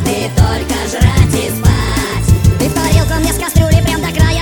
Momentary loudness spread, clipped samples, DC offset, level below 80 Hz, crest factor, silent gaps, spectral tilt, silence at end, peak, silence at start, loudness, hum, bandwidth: 4 LU; 0.6%; under 0.1%; -18 dBFS; 12 dB; none; -5.5 dB/octave; 0 s; 0 dBFS; 0 s; -13 LUFS; none; 19 kHz